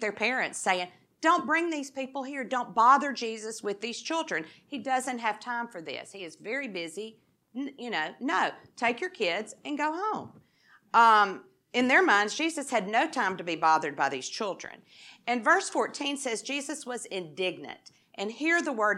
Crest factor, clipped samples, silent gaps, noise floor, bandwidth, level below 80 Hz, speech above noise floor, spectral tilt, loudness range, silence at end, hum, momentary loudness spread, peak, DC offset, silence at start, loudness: 20 dB; under 0.1%; none; -62 dBFS; 14 kHz; -88 dBFS; 34 dB; -2.5 dB/octave; 8 LU; 0 s; none; 17 LU; -8 dBFS; under 0.1%; 0 s; -28 LUFS